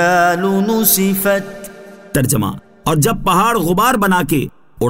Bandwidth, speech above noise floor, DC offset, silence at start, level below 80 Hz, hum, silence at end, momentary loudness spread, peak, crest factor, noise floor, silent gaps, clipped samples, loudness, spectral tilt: 16.5 kHz; 21 dB; under 0.1%; 0 s; -40 dBFS; none; 0 s; 11 LU; 0 dBFS; 14 dB; -35 dBFS; none; under 0.1%; -14 LUFS; -4.5 dB/octave